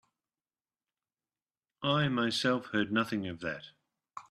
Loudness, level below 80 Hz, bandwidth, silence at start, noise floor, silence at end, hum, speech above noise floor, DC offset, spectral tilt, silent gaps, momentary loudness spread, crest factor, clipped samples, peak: -31 LUFS; -70 dBFS; 13 kHz; 1.8 s; under -90 dBFS; 0.1 s; none; over 59 dB; under 0.1%; -5 dB/octave; none; 14 LU; 20 dB; under 0.1%; -16 dBFS